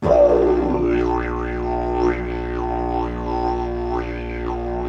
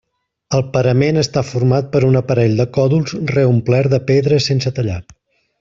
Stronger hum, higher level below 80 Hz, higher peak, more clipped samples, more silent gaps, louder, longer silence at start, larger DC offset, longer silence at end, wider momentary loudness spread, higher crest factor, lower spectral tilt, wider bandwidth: first, 60 Hz at -30 dBFS vs none; first, -30 dBFS vs -46 dBFS; about the same, -2 dBFS vs -2 dBFS; neither; neither; second, -21 LUFS vs -15 LUFS; second, 0 s vs 0.5 s; neither; second, 0 s vs 0.6 s; first, 10 LU vs 6 LU; first, 18 dB vs 12 dB; first, -8.5 dB/octave vs -6.5 dB/octave; about the same, 7 kHz vs 7.6 kHz